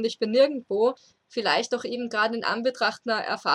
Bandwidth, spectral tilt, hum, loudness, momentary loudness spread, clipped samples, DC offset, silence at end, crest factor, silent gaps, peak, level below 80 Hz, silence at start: 11 kHz; -3.5 dB/octave; none; -25 LUFS; 7 LU; under 0.1%; under 0.1%; 0 s; 18 dB; none; -8 dBFS; -78 dBFS; 0 s